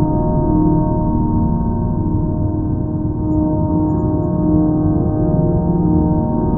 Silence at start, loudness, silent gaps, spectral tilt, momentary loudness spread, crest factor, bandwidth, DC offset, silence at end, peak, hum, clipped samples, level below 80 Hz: 0 s; -17 LUFS; none; -15 dB/octave; 4 LU; 14 dB; 1.8 kHz; under 0.1%; 0 s; -2 dBFS; none; under 0.1%; -24 dBFS